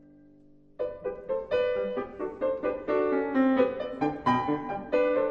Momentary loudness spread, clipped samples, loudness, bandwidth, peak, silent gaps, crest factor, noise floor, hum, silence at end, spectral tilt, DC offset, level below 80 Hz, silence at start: 9 LU; under 0.1%; -29 LUFS; 6.6 kHz; -10 dBFS; none; 18 dB; -56 dBFS; none; 0 s; -7.5 dB/octave; under 0.1%; -58 dBFS; 0.8 s